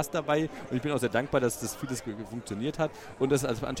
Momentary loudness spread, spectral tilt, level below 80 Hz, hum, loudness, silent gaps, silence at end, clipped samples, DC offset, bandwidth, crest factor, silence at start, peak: 8 LU; -5 dB/octave; -54 dBFS; none; -31 LUFS; none; 0 s; under 0.1%; under 0.1%; 16.5 kHz; 18 dB; 0 s; -12 dBFS